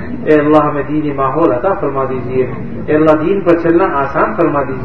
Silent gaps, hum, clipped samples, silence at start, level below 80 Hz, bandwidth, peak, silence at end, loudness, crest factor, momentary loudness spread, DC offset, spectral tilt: none; none; 0.3%; 0 s; -38 dBFS; 6 kHz; 0 dBFS; 0 s; -13 LUFS; 12 dB; 7 LU; 5%; -9.5 dB/octave